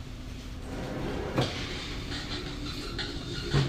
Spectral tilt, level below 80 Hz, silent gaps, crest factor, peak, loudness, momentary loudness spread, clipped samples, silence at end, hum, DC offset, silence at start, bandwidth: -5 dB/octave; -42 dBFS; none; 20 dB; -14 dBFS; -34 LUFS; 10 LU; under 0.1%; 0 s; none; under 0.1%; 0 s; 15.5 kHz